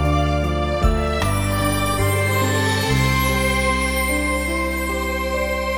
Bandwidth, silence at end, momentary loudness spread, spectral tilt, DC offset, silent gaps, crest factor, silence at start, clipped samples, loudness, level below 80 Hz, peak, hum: 20 kHz; 0 s; 4 LU; -5 dB/octave; under 0.1%; none; 14 dB; 0 s; under 0.1%; -20 LUFS; -26 dBFS; -4 dBFS; none